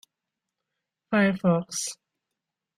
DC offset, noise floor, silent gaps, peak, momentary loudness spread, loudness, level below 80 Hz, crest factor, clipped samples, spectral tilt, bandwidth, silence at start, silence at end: under 0.1%; -86 dBFS; none; -10 dBFS; 12 LU; -25 LUFS; -68 dBFS; 18 dB; under 0.1%; -5 dB/octave; 15 kHz; 1.1 s; 0.85 s